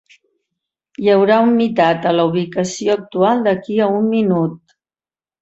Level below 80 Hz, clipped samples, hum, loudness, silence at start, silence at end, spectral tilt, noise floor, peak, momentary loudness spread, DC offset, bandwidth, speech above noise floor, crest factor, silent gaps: -60 dBFS; under 0.1%; none; -16 LUFS; 1 s; 0.85 s; -6 dB/octave; under -90 dBFS; -2 dBFS; 7 LU; under 0.1%; 8.2 kHz; over 75 dB; 14 dB; none